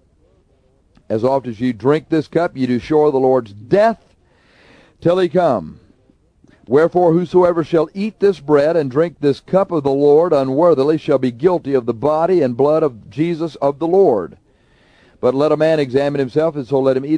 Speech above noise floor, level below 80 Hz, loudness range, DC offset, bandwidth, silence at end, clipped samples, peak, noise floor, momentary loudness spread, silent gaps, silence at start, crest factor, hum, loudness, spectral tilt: 41 dB; -52 dBFS; 3 LU; under 0.1%; 10 kHz; 0 s; under 0.1%; -2 dBFS; -56 dBFS; 7 LU; none; 1.1 s; 14 dB; none; -16 LUFS; -8 dB/octave